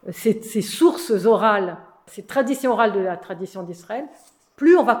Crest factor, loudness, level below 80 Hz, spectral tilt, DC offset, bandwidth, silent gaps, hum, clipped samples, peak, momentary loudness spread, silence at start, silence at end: 18 dB; -20 LUFS; -70 dBFS; -5 dB/octave; under 0.1%; 19 kHz; none; none; under 0.1%; -4 dBFS; 18 LU; 0.05 s; 0 s